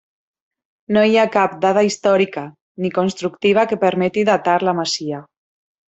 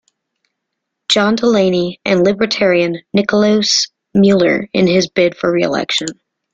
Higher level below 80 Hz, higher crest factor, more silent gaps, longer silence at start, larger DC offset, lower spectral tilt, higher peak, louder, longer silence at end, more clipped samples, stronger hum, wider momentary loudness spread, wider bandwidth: second, -62 dBFS vs -52 dBFS; about the same, 16 dB vs 14 dB; first, 2.61-2.75 s vs none; second, 0.9 s vs 1.1 s; neither; about the same, -5 dB/octave vs -4.5 dB/octave; about the same, -2 dBFS vs 0 dBFS; second, -17 LUFS vs -14 LUFS; first, 0.65 s vs 0.4 s; neither; neither; first, 10 LU vs 5 LU; second, 8.2 kHz vs 9.2 kHz